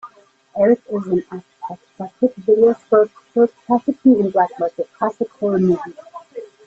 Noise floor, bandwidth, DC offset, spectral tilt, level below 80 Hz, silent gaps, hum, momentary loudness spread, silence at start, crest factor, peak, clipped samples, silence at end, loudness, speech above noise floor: -49 dBFS; 7.6 kHz; under 0.1%; -9.5 dB/octave; -62 dBFS; none; none; 19 LU; 0.05 s; 16 dB; -2 dBFS; under 0.1%; 0.2 s; -18 LUFS; 32 dB